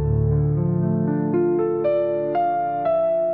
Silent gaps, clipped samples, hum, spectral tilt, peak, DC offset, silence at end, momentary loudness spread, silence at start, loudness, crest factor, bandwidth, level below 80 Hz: none; under 0.1%; none; -10 dB/octave; -10 dBFS; 0.1%; 0 s; 2 LU; 0 s; -21 LUFS; 10 dB; 4.3 kHz; -38 dBFS